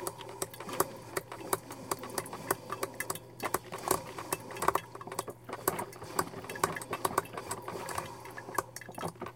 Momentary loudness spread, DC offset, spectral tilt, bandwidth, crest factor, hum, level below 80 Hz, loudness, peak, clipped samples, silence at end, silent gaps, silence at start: 7 LU; under 0.1%; -3 dB/octave; 17 kHz; 30 dB; none; -64 dBFS; -37 LUFS; -8 dBFS; under 0.1%; 0 s; none; 0 s